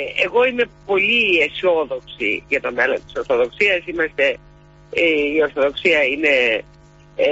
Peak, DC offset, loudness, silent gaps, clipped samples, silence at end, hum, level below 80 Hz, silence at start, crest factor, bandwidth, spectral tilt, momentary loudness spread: -4 dBFS; under 0.1%; -18 LUFS; none; under 0.1%; 0 s; none; -50 dBFS; 0 s; 16 dB; 8 kHz; -4 dB/octave; 8 LU